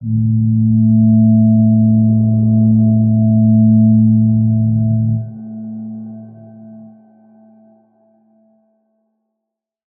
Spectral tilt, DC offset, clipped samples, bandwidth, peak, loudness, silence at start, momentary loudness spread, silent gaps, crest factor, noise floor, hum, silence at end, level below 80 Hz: -18.5 dB/octave; under 0.1%; under 0.1%; 0.9 kHz; -2 dBFS; -12 LUFS; 0 s; 17 LU; none; 10 dB; -80 dBFS; none; 3.15 s; -46 dBFS